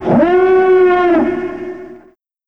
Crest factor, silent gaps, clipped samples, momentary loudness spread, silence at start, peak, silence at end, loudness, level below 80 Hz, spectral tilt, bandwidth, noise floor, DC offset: 12 dB; none; under 0.1%; 17 LU; 0 s; 0 dBFS; 0.5 s; -11 LUFS; -46 dBFS; -8.5 dB/octave; 5.4 kHz; -46 dBFS; 0.7%